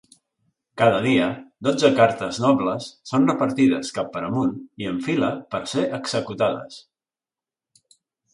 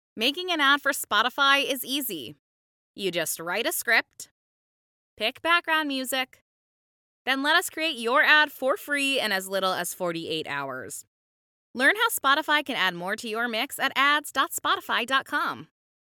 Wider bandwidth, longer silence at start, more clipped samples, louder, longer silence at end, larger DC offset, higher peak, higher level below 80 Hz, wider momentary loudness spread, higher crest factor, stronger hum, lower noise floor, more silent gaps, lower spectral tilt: second, 11.5 kHz vs 18 kHz; first, 0.75 s vs 0.15 s; neither; about the same, -22 LUFS vs -24 LUFS; first, 1.55 s vs 0.4 s; neither; about the same, -2 dBFS vs -4 dBFS; first, -60 dBFS vs -78 dBFS; about the same, 10 LU vs 11 LU; about the same, 20 dB vs 22 dB; neither; about the same, under -90 dBFS vs under -90 dBFS; second, none vs 2.39-2.94 s, 4.31-5.17 s, 6.41-7.25 s, 11.07-11.74 s; first, -5.5 dB/octave vs -1.5 dB/octave